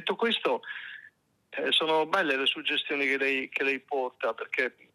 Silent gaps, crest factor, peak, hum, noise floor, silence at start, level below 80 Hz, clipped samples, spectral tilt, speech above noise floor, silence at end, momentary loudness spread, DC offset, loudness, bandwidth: none; 18 dB; -12 dBFS; none; -58 dBFS; 0 s; -86 dBFS; under 0.1%; -3 dB/octave; 29 dB; 0.25 s; 13 LU; under 0.1%; -27 LUFS; 13 kHz